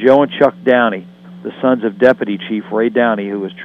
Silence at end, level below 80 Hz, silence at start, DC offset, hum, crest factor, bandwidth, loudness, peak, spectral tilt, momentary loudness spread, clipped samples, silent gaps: 0 s; -60 dBFS; 0 s; under 0.1%; none; 14 dB; 6 kHz; -14 LUFS; 0 dBFS; -7.5 dB/octave; 11 LU; under 0.1%; none